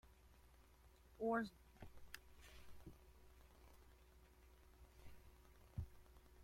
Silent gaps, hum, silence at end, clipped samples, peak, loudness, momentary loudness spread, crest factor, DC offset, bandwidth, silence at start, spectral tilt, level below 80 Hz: none; none; 0 s; under 0.1%; -30 dBFS; -49 LUFS; 25 LU; 24 dB; under 0.1%; 16.5 kHz; 0.05 s; -6.5 dB/octave; -66 dBFS